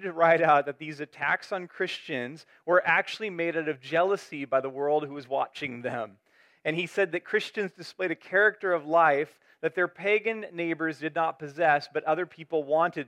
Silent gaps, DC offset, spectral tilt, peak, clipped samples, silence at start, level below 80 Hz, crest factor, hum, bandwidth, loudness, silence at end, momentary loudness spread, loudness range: none; under 0.1%; -5.5 dB/octave; -8 dBFS; under 0.1%; 0 s; -82 dBFS; 20 dB; none; 12.5 kHz; -27 LUFS; 0.05 s; 12 LU; 4 LU